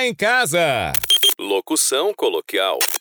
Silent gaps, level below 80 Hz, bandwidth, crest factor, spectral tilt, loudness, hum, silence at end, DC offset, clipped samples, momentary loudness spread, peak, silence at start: none; -52 dBFS; over 20 kHz; 16 dB; -1.5 dB/octave; -17 LUFS; none; 0 s; under 0.1%; under 0.1%; 7 LU; -4 dBFS; 0 s